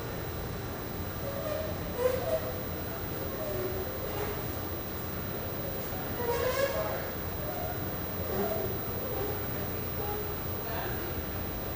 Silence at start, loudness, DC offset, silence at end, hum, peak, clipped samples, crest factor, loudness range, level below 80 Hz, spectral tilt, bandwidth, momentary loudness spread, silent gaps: 0 s; -33 LUFS; under 0.1%; 0 s; none; -16 dBFS; under 0.1%; 18 dB; 2 LU; -46 dBFS; -5.5 dB/octave; 15.5 kHz; 5 LU; none